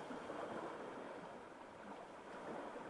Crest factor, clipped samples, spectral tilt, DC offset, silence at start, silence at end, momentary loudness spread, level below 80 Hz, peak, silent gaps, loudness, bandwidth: 16 dB; under 0.1%; -5 dB/octave; under 0.1%; 0 s; 0 s; 7 LU; -80 dBFS; -36 dBFS; none; -51 LUFS; 11.5 kHz